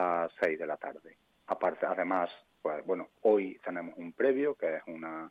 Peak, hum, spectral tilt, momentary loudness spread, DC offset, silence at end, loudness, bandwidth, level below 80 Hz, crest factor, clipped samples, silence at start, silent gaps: -14 dBFS; none; -7.5 dB/octave; 12 LU; under 0.1%; 0 s; -33 LUFS; 6 kHz; -80 dBFS; 18 dB; under 0.1%; 0 s; none